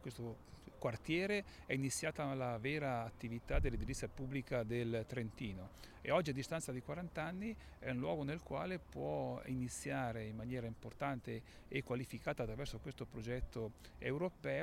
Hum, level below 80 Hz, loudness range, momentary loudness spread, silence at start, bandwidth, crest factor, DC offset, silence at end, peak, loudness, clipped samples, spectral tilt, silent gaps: none; -54 dBFS; 4 LU; 9 LU; 0 s; 16 kHz; 20 dB; under 0.1%; 0 s; -22 dBFS; -43 LUFS; under 0.1%; -5.5 dB/octave; none